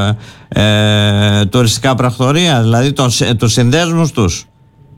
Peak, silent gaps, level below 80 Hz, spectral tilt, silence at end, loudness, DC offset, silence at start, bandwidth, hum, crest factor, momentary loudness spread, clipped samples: -2 dBFS; none; -38 dBFS; -5 dB/octave; 0.55 s; -11 LUFS; under 0.1%; 0 s; 16 kHz; none; 10 dB; 6 LU; under 0.1%